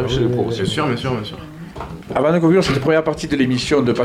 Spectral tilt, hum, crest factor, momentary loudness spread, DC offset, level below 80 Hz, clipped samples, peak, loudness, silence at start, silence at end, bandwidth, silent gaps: -6 dB/octave; none; 14 dB; 17 LU; under 0.1%; -40 dBFS; under 0.1%; -4 dBFS; -18 LUFS; 0 s; 0 s; 14.5 kHz; none